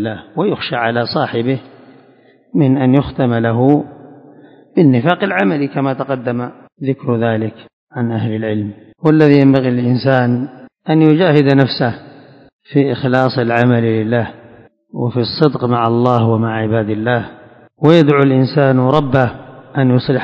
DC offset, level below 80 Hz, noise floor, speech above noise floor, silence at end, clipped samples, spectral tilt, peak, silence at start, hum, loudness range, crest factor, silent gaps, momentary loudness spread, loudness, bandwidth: under 0.1%; -48 dBFS; -48 dBFS; 35 dB; 0 s; 0.2%; -9 dB/octave; 0 dBFS; 0 s; none; 4 LU; 14 dB; 7.73-7.87 s, 12.53-12.59 s; 12 LU; -14 LUFS; 6.6 kHz